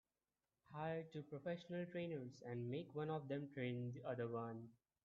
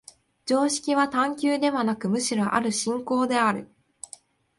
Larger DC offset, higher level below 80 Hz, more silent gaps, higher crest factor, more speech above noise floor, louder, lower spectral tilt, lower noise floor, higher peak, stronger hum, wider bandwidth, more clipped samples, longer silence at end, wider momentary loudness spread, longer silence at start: neither; second, -84 dBFS vs -68 dBFS; neither; about the same, 16 dB vs 18 dB; first, over 42 dB vs 27 dB; second, -49 LUFS vs -24 LUFS; first, -6.5 dB/octave vs -4 dB/octave; first, under -90 dBFS vs -51 dBFS; second, -32 dBFS vs -8 dBFS; neither; second, 7.2 kHz vs 11.5 kHz; neither; second, 0.3 s vs 0.95 s; second, 6 LU vs 16 LU; first, 0.7 s vs 0.45 s